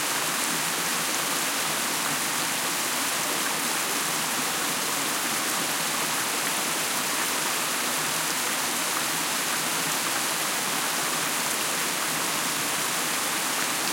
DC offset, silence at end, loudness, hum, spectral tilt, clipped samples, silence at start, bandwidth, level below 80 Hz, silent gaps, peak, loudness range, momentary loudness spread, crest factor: under 0.1%; 0 s; -24 LUFS; none; -0.5 dB/octave; under 0.1%; 0 s; 16.5 kHz; -72 dBFS; none; -10 dBFS; 0 LU; 0 LU; 18 dB